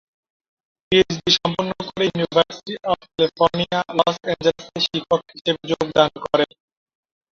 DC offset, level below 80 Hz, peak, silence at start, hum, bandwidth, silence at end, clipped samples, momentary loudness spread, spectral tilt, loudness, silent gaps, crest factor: under 0.1%; -54 dBFS; 0 dBFS; 0.9 s; none; 7.4 kHz; 0.95 s; under 0.1%; 7 LU; -4.5 dB/octave; -20 LUFS; 5.41-5.45 s; 20 dB